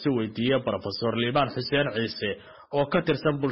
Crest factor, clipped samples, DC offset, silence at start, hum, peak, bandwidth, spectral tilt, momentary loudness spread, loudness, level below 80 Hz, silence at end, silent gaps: 16 dB; under 0.1%; under 0.1%; 0 s; none; -10 dBFS; 6 kHz; -4 dB/octave; 7 LU; -26 LUFS; -58 dBFS; 0 s; none